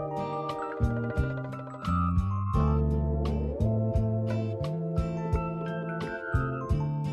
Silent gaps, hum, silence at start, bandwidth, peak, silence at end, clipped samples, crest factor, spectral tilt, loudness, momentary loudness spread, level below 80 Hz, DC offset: none; none; 0 s; 8.4 kHz; -14 dBFS; 0 s; under 0.1%; 14 dB; -9 dB/octave; -30 LUFS; 6 LU; -36 dBFS; under 0.1%